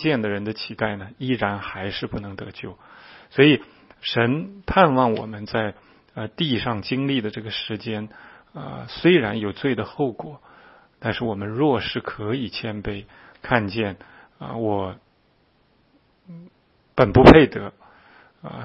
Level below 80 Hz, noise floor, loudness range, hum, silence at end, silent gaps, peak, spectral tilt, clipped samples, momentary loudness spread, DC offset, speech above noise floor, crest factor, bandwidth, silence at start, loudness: -42 dBFS; -62 dBFS; 10 LU; none; 0 s; none; 0 dBFS; -8 dB/octave; under 0.1%; 19 LU; under 0.1%; 41 dB; 22 dB; 7.6 kHz; 0 s; -21 LUFS